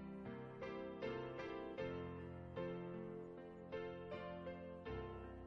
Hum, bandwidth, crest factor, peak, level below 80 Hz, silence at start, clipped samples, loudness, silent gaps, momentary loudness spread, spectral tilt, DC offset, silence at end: none; 7.2 kHz; 16 dB; -34 dBFS; -66 dBFS; 0 s; under 0.1%; -50 LUFS; none; 5 LU; -8 dB/octave; under 0.1%; 0 s